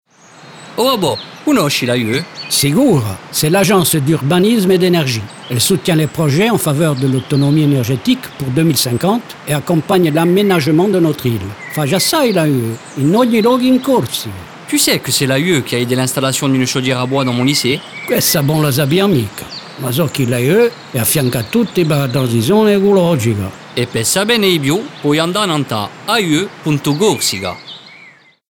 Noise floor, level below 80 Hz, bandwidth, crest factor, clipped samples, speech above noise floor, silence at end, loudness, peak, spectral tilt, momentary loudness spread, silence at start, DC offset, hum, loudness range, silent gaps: -43 dBFS; -50 dBFS; 19.5 kHz; 12 dB; under 0.1%; 30 dB; 0.4 s; -14 LUFS; -2 dBFS; -4.5 dB/octave; 8 LU; 0.4 s; under 0.1%; none; 2 LU; none